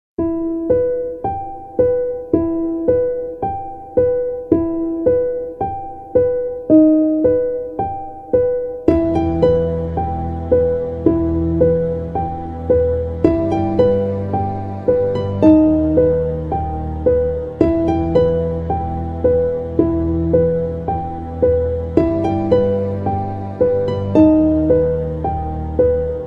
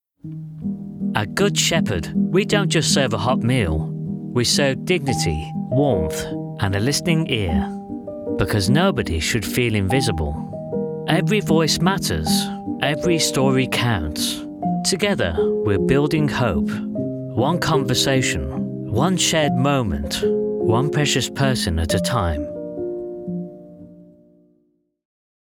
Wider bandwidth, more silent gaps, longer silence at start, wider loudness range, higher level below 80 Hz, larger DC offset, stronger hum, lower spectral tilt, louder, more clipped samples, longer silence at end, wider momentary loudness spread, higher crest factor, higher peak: second, 5.2 kHz vs 17.5 kHz; neither; about the same, 0.2 s vs 0.25 s; about the same, 3 LU vs 2 LU; first, -32 dBFS vs -40 dBFS; neither; neither; first, -10.5 dB/octave vs -4.5 dB/octave; first, -17 LUFS vs -20 LUFS; neither; second, 0 s vs 1.4 s; about the same, 9 LU vs 11 LU; about the same, 16 dB vs 20 dB; about the same, 0 dBFS vs -2 dBFS